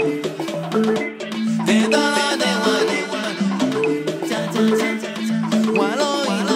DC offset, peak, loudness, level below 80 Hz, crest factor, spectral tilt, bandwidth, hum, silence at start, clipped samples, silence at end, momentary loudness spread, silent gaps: under 0.1%; -4 dBFS; -20 LUFS; -70 dBFS; 16 dB; -4.5 dB/octave; 16 kHz; none; 0 s; under 0.1%; 0 s; 7 LU; none